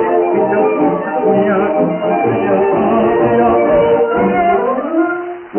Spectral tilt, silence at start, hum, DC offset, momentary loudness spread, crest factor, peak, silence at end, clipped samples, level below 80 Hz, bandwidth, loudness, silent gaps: -6.5 dB/octave; 0 s; none; under 0.1%; 4 LU; 10 dB; -2 dBFS; 0 s; under 0.1%; -46 dBFS; 3.2 kHz; -13 LUFS; none